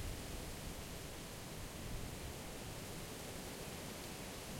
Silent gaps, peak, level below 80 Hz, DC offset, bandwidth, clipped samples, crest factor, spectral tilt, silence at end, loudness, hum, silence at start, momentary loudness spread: none; -34 dBFS; -54 dBFS; under 0.1%; 16.5 kHz; under 0.1%; 14 dB; -3.5 dB/octave; 0 s; -48 LUFS; none; 0 s; 1 LU